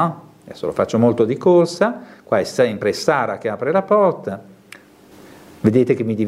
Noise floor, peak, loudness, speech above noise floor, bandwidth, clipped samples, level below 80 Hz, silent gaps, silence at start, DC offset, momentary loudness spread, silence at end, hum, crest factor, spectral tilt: -45 dBFS; 0 dBFS; -18 LUFS; 28 dB; 14.5 kHz; under 0.1%; -62 dBFS; none; 0 s; under 0.1%; 13 LU; 0 s; none; 18 dB; -6.5 dB/octave